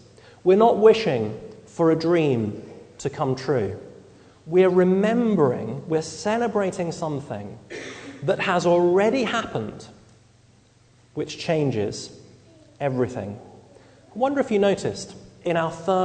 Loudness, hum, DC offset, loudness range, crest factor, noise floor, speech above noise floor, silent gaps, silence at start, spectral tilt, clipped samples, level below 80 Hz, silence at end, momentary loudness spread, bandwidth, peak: -22 LUFS; none; under 0.1%; 7 LU; 20 dB; -56 dBFS; 35 dB; none; 0.45 s; -6 dB/octave; under 0.1%; -60 dBFS; 0 s; 19 LU; 9.4 kHz; -4 dBFS